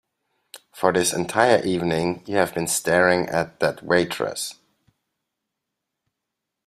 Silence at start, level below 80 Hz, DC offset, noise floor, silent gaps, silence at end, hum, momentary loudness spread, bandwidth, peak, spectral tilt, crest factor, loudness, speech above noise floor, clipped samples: 0.55 s; -60 dBFS; under 0.1%; -82 dBFS; none; 2.15 s; none; 8 LU; 15.5 kHz; 0 dBFS; -4 dB/octave; 22 dB; -21 LUFS; 61 dB; under 0.1%